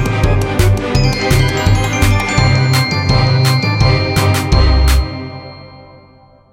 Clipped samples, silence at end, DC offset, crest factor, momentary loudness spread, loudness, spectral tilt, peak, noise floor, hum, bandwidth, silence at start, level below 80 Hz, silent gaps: under 0.1%; 0.7 s; under 0.1%; 12 dB; 4 LU; -13 LUFS; -5.5 dB/octave; -2 dBFS; -44 dBFS; none; 16.5 kHz; 0 s; -18 dBFS; none